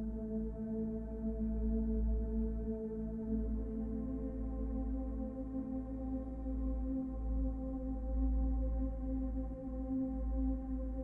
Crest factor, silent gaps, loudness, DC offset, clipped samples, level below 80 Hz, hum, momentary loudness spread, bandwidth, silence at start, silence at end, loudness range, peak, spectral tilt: 12 dB; none; -40 LUFS; under 0.1%; under 0.1%; -40 dBFS; none; 5 LU; 1.9 kHz; 0 s; 0 s; 2 LU; -26 dBFS; -12.5 dB/octave